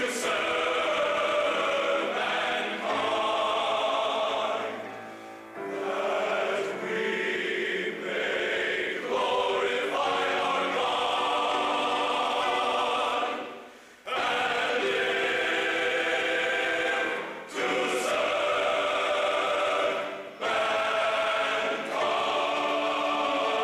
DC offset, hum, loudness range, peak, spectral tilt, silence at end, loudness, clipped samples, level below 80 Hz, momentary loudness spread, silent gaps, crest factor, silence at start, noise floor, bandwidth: under 0.1%; none; 3 LU; -16 dBFS; -2 dB/octave; 0 s; -27 LUFS; under 0.1%; -68 dBFS; 5 LU; none; 12 dB; 0 s; -48 dBFS; 15 kHz